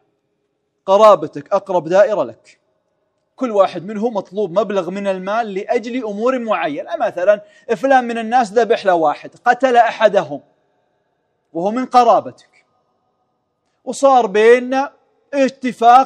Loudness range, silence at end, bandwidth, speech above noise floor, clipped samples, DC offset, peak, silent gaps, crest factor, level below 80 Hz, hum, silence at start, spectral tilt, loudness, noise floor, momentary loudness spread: 4 LU; 0 s; 10 kHz; 54 dB; under 0.1%; under 0.1%; 0 dBFS; none; 16 dB; -68 dBFS; none; 0.85 s; -5 dB/octave; -16 LUFS; -69 dBFS; 12 LU